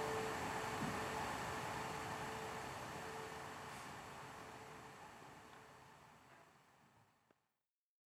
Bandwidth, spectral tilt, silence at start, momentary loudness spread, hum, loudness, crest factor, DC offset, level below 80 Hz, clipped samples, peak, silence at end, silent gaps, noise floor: 17 kHz; -4 dB/octave; 0 s; 19 LU; none; -47 LUFS; 16 dB; under 0.1%; -70 dBFS; under 0.1%; -32 dBFS; 1.1 s; none; under -90 dBFS